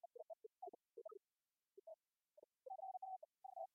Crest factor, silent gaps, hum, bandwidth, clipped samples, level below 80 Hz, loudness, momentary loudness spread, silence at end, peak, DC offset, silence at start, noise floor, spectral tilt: 18 dB; none; none; 1.3 kHz; under 0.1%; under -90 dBFS; -58 LUFS; 13 LU; 0.1 s; -40 dBFS; under 0.1%; 0.05 s; under -90 dBFS; 13.5 dB/octave